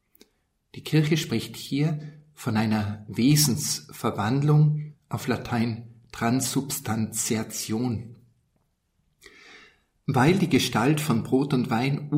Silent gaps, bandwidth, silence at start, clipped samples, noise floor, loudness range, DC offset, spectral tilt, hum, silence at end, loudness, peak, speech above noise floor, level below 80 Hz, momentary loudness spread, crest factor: none; 16 kHz; 0.75 s; under 0.1%; -71 dBFS; 5 LU; under 0.1%; -5 dB/octave; none; 0 s; -25 LUFS; -10 dBFS; 47 dB; -60 dBFS; 13 LU; 16 dB